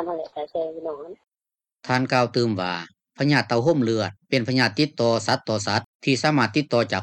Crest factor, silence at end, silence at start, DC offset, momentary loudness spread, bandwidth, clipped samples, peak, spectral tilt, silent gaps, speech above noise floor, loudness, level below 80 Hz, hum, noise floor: 18 dB; 0 s; 0 s; under 0.1%; 12 LU; 11.5 kHz; under 0.1%; -6 dBFS; -5.5 dB/octave; 5.86-6.00 s; over 67 dB; -23 LUFS; -66 dBFS; none; under -90 dBFS